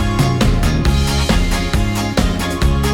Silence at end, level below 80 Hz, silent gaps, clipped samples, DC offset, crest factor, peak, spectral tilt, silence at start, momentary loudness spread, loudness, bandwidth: 0 s; -18 dBFS; none; under 0.1%; under 0.1%; 14 dB; 0 dBFS; -5.5 dB/octave; 0 s; 3 LU; -16 LUFS; 17 kHz